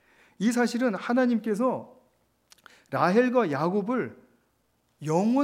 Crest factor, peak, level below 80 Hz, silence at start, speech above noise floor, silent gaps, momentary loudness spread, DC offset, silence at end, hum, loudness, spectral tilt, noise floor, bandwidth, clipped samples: 18 dB; -8 dBFS; -80 dBFS; 0.4 s; 46 dB; none; 10 LU; under 0.1%; 0 s; none; -26 LUFS; -6.5 dB/octave; -71 dBFS; 14 kHz; under 0.1%